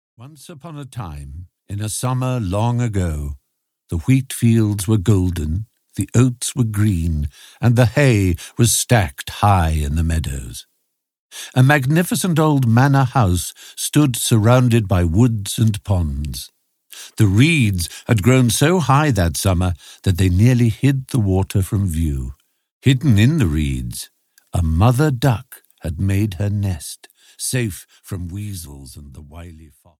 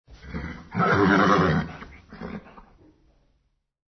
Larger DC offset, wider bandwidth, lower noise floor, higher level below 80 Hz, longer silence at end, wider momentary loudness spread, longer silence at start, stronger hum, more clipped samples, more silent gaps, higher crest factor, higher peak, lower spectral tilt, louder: neither; first, 16 kHz vs 6.4 kHz; about the same, -72 dBFS vs -71 dBFS; first, -32 dBFS vs -48 dBFS; second, 0.35 s vs 1.6 s; second, 18 LU vs 22 LU; about the same, 0.2 s vs 0.1 s; neither; neither; first, 11.19-11.30 s, 22.71-22.81 s vs none; about the same, 16 dB vs 20 dB; first, -2 dBFS vs -6 dBFS; second, -5.5 dB/octave vs -7 dB/octave; first, -17 LUFS vs -21 LUFS